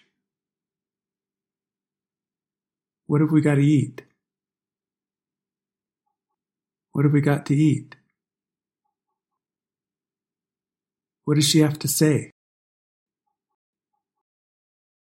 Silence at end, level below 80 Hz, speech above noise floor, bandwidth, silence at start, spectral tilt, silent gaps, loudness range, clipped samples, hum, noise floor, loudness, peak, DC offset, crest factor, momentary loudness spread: 2.9 s; -68 dBFS; over 71 dB; 16 kHz; 3.1 s; -5.5 dB/octave; none; 6 LU; under 0.1%; none; under -90 dBFS; -20 LUFS; -6 dBFS; under 0.1%; 20 dB; 9 LU